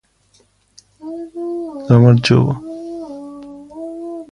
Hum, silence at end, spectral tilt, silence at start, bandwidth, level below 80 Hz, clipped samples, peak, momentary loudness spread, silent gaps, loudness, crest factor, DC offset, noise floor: none; 0.1 s; -7.5 dB/octave; 1 s; 9.8 kHz; -50 dBFS; under 0.1%; 0 dBFS; 23 LU; none; -15 LUFS; 18 dB; under 0.1%; -56 dBFS